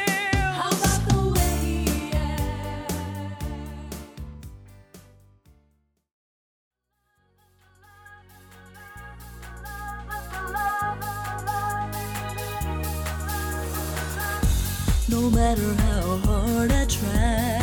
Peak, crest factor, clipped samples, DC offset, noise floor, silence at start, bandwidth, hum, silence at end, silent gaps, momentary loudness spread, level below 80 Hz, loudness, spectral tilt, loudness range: -8 dBFS; 18 dB; under 0.1%; under 0.1%; -72 dBFS; 0 s; over 20 kHz; none; 0 s; 6.13-6.71 s; 18 LU; -30 dBFS; -26 LUFS; -5 dB/octave; 20 LU